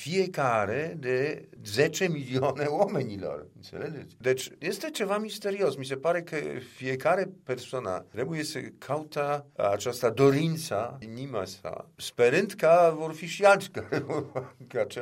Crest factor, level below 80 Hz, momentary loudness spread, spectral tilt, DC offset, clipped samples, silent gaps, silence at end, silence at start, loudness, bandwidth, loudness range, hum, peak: 20 dB; -70 dBFS; 15 LU; -5 dB/octave; under 0.1%; under 0.1%; none; 0 s; 0 s; -28 LUFS; 16 kHz; 6 LU; none; -8 dBFS